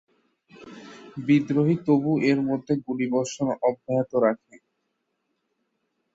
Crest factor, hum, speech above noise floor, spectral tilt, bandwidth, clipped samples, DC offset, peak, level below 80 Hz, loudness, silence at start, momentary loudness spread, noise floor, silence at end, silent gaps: 18 dB; none; 53 dB; -7 dB/octave; 8 kHz; under 0.1%; under 0.1%; -8 dBFS; -66 dBFS; -24 LUFS; 0.6 s; 16 LU; -76 dBFS; 1.8 s; none